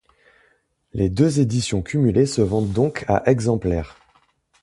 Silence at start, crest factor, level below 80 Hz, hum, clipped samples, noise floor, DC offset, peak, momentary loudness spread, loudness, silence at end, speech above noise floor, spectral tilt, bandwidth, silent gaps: 0.95 s; 18 dB; -40 dBFS; none; under 0.1%; -63 dBFS; under 0.1%; -2 dBFS; 7 LU; -20 LUFS; 0.75 s; 44 dB; -6.5 dB/octave; 11.5 kHz; none